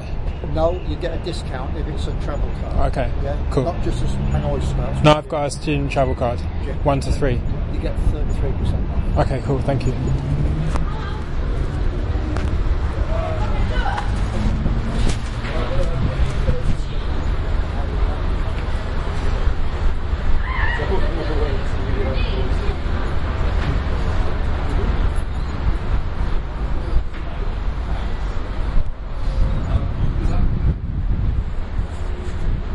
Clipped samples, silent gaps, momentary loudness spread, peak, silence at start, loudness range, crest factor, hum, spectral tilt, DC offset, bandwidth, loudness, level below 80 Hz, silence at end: under 0.1%; none; 6 LU; 0 dBFS; 0 s; 4 LU; 18 dB; none; -7 dB/octave; under 0.1%; 11 kHz; -23 LUFS; -22 dBFS; 0 s